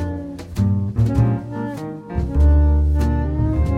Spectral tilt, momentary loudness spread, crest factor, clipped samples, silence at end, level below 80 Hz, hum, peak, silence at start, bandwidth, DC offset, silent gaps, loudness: -9.5 dB/octave; 12 LU; 12 dB; under 0.1%; 0 s; -20 dBFS; none; -6 dBFS; 0 s; 6.6 kHz; under 0.1%; none; -19 LUFS